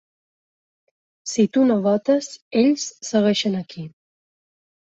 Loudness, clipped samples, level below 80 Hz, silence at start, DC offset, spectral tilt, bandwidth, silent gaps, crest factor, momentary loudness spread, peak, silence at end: -20 LUFS; under 0.1%; -68 dBFS; 1.25 s; under 0.1%; -5 dB/octave; 8.2 kHz; 2.42-2.51 s; 16 dB; 17 LU; -6 dBFS; 1 s